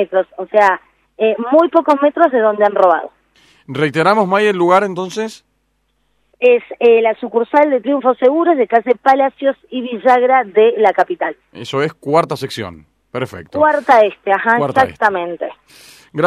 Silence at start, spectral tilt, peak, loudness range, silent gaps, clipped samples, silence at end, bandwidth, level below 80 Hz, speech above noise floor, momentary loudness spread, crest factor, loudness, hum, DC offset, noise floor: 0 s; -6 dB/octave; 0 dBFS; 3 LU; none; under 0.1%; 0 s; 13 kHz; -60 dBFS; 50 dB; 13 LU; 14 dB; -14 LUFS; none; under 0.1%; -64 dBFS